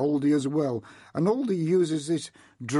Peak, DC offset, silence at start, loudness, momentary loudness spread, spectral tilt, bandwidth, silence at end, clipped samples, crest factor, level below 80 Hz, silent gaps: -14 dBFS; under 0.1%; 0 s; -26 LUFS; 12 LU; -6.5 dB/octave; 11.5 kHz; 0 s; under 0.1%; 12 dB; -70 dBFS; none